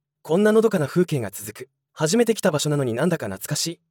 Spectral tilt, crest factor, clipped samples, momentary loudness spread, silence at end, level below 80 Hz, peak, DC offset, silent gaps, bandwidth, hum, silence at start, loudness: -5 dB/octave; 16 dB; under 0.1%; 12 LU; 0.15 s; -70 dBFS; -6 dBFS; under 0.1%; none; 18 kHz; none; 0.25 s; -22 LUFS